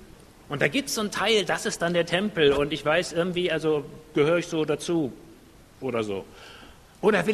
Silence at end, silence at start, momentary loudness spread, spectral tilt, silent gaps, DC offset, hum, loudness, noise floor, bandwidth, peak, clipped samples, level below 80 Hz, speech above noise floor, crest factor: 0 s; 0 s; 11 LU; -4.5 dB/octave; none; under 0.1%; none; -25 LUFS; -51 dBFS; 13.5 kHz; -6 dBFS; under 0.1%; -54 dBFS; 26 dB; 20 dB